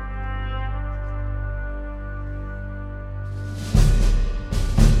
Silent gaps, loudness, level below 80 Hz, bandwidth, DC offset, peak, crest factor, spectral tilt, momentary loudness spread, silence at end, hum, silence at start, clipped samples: none; -26 LUFS; -22 dBFS; 12.5 kHz; under 0.1%; -2 dBFS; 20 dB; -6 dB/octave; 13 LU; 0 s; 50 Hz at -40 dBFS; 0 s; under 0.1%